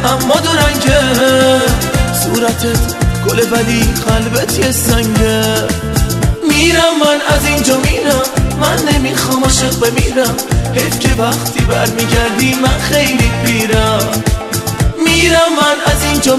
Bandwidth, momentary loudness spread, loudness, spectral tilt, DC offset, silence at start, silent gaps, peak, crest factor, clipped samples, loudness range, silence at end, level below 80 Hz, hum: 15.5 kHz; 5 LU; -11 LUFS; -4 dB/octave; under 0.1%; 0 s; none; 0 dBFS; 12 dB; under 0.1%; 1 LU; 0 s; -22 dBFS; none